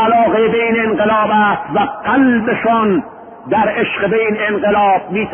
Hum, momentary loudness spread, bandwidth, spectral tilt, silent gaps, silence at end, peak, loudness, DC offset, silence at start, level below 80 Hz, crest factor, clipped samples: none; 5 LU; 3.7 kHz; -11.5 dB/octave; none; 0 s; -2 dBFS; -14 LUFS; under 0.1%; 0 s; -48 dBFS; 12 dB; under 0.1%